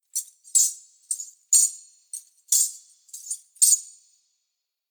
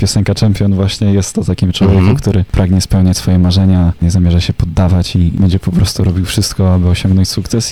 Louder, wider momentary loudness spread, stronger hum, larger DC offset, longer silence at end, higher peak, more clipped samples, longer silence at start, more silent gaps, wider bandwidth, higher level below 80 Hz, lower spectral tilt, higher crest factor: second, -21 LUFS vs -12 LUFS; first, 21 LU vs 4 LU; neither; neither; first, 1.05 s vs 0 s; about the same, -4 dBFS vs -2 dBFS; neither; first, 0.15 s vs 0 s; neither; first, over 20 kHz vs 13.5 kHz; second, under -90 dBFS vs -24 dBFS; second, 9 dB/octave vs -6 dB/octave; first, 22 dB vs 8 dB